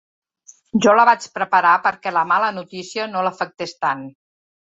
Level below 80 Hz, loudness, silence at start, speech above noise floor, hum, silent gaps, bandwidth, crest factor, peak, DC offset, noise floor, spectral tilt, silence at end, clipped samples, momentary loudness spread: -66 dBFS; -18 LUFS; 0.75 s; 33 dB; none; none; 8 kHz; 18 dB; -2 dBFS; under 0.1%; -51 dBFS; -4 dB/octave; 0.6 s; under 0.1%; 14 LU